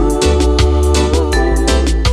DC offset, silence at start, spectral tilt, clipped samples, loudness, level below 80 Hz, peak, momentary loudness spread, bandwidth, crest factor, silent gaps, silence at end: under 0.1%; 0 s; -5.5 dB/octave; under 0.1%; -13 LUFS; -14 dBFS; 0 dBFS; 2 LU; 14 kHz; 10 dB; none; 0 s